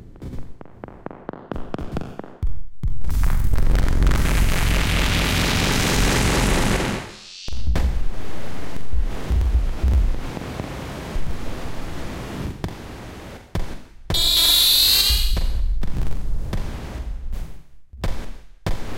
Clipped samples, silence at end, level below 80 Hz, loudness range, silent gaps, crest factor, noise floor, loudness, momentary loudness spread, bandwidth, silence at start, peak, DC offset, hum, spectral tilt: under 0.1%; 0 s; -24 dBFS; 14 LU; none; 14 dB; -39 dBFS; -21 LUFS; 19 LU; 17 kHz; 0 s; -6 dBFS; under 0.1%; none; -3.5 dB/octave